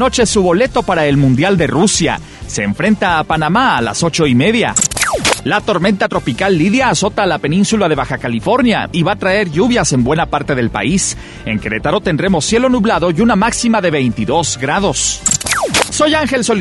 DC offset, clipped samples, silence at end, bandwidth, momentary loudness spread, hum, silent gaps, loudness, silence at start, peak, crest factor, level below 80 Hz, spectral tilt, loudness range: under 0.1%; under 0.1%; 0 s; 12 kHz; 4 LU; none; none; -13 LUFS; 0 s; 0 dBFS; 14 dB; -34 dBFS; -4 dB/octave; 2 LU